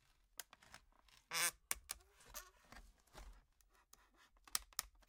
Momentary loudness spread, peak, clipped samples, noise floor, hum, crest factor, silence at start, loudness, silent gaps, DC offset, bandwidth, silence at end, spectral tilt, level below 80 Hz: 24 LU; -16 dBFS; under 0.1%; -75 dBFS; none; 36 dB; 0.4 s; -45 LUFS; none; under 0.1%; 17 kHz; 0.2 s; 1 dB/octave; -68 dBFS